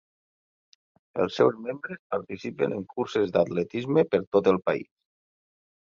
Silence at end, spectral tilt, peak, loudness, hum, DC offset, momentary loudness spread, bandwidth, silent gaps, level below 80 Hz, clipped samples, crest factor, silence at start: 1 s; -7 dB/octave; -8 dBFS; -27 LUFS; none; under 0.1%; 12 LU; 7.4 kHz; 1.99-2.10 s, 4.27-4.32 s; -64 dBFS; under 0.1%; 20 dB; 1.15 s